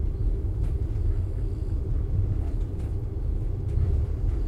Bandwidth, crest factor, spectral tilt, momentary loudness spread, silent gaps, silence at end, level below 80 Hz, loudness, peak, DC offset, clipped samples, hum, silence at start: 3.5 kHz; 12 dB; -10 dB/octave; 4 LU; none; 0 s; -28 dBFS; -29 LUFS; -14 dBFS; under 0.1%; under 0.1%; none; 0 s